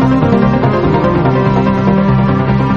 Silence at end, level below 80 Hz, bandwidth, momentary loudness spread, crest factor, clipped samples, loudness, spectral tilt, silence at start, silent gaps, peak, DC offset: 0 s; -28 dBFS; 6.6 kHz; 1 LU; 10 dB; under 0.1%; -11 LUFS; -9.5 dB/octave; 0 s; none; 0 dBFS; 1%